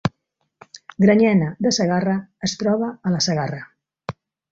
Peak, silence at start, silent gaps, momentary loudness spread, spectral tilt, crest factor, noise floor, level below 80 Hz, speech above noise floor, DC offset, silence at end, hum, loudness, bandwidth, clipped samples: -4 dBFS; 0.05 s; none; 19 LU; -5.5 dB/octave; 18 dB; -73 dBFS; -56 dBFS; 54 dB; under 0.1%; 0.4 s; none; -20 LUFS; 7.8 kHz; under 0.1%